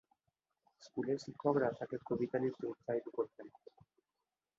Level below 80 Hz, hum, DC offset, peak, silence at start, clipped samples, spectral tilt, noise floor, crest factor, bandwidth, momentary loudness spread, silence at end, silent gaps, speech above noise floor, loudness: -78 dBFS; none; under 0.1%; -20 dBFS; 0.8 s; under 0.1%; -6.5 dB/octave; under -90 dBFS; 22 dB; 7.4 kHz; 10 LU; 1.1 s; none; over 51 dB; -39 LUFS